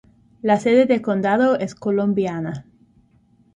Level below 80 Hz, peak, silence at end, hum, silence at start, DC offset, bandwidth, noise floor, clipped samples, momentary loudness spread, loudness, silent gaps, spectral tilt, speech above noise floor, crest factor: -60 dBFS; -4 dBFS; 0.95 s; none; 0.45 s; under 0.1%; 9.8 kHz; -57 dBFS; under 0.1%; 12 LU; -19 LUFS; none; -7 dB/octave; 39 dB; 18 dB